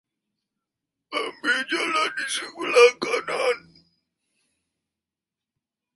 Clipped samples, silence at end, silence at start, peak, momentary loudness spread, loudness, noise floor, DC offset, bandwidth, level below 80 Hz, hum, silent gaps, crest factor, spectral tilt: under 0.1%; 2.35 s; 1.1 s; -2 dBFS; 13 LU; -23 LUFS; -89 dBFS; under 0.1%; 11.5 kHz; -76 dBFS; none; none; 24 dB; -1 dB/octave